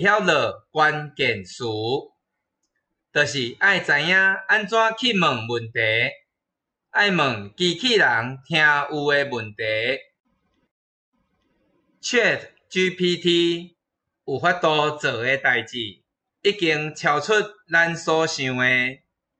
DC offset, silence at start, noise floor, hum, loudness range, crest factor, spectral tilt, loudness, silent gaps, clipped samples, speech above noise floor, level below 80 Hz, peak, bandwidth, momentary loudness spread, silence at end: under 0.1%; 0 s; -84 dBFS; none; 5 LU; 16 dB; -4 dB/octave; -21 LUFS; 10.20-10.24 s, 10.71-11.12 s; under 0.1%; 63 dB; -66 dBFS; -6 dBFS; 8.8 kHz; 10 LU; 0.45 s